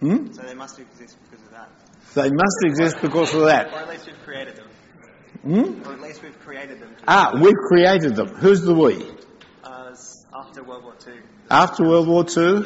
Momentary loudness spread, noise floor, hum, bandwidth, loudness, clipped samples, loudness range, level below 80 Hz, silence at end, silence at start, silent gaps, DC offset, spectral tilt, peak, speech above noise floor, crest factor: 24 LU; -48 dBFS; none; 8 kHz; -17 LUFS; under 0.1%; 7 LU; -58 dBFS; 0 s; 0 s; none; under 0.1%; -4.5 dB/octave; -4 dBFS; 30 dB; 16 dB